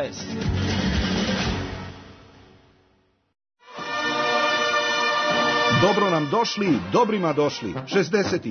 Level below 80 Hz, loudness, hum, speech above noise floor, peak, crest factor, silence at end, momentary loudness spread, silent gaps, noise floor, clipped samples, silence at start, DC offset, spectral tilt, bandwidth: -42 dBFS; -22 LUFS; none; 41 dB; -8 dBFS; 16 dB; 0 s; 11 LU; none; -64 dBFS; under 0.1%; 0 s; under 0.1%; -4.5 dB/octave; 6.6 kHz